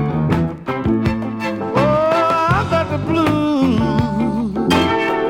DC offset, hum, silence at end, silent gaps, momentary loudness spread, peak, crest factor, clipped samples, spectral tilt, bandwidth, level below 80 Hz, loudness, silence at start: under 0.1%; none; 0 s; none; 6 LU; -2 dBFS; 14 dB; under 0.1%; -7 dB/octave; 16.5 kHz; -38 dBFS; -17 LUFS; 0 s